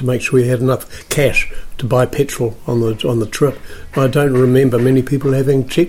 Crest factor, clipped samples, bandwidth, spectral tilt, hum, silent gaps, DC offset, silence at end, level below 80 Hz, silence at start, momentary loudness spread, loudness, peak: 12 dB; under 0.1%; 16.5 kHz; -6.5 dB/octave; none; none; under 0.1%; 0 s; -32 dBFS; 0 s; 9 LU; -15 LUFS; -2 dBFS